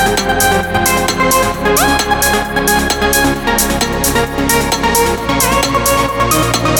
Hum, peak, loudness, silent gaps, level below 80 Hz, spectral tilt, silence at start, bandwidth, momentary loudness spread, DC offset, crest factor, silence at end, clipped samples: none; 0 dBFS; -12 LUFS; none; -26 dBFS; -3 dB/octave; 0 s; over 20 kHz; 2 LU; under 0.1%; 12 dB; 0 s; under 0.1%